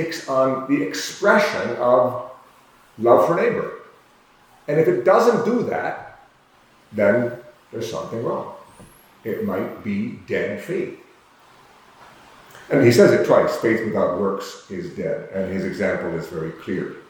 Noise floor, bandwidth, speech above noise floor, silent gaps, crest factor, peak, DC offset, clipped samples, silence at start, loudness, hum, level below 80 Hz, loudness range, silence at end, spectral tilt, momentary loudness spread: -54 dBFS; 19.5 kHz; 35 dB; none; 20 dB; -2 dBFS; under 0.1%; under 0.1%; 0 s; -20 LUFS; none; -62 dBFS; 9 LU; 0.1 s; -6 dB/octave; 16 LU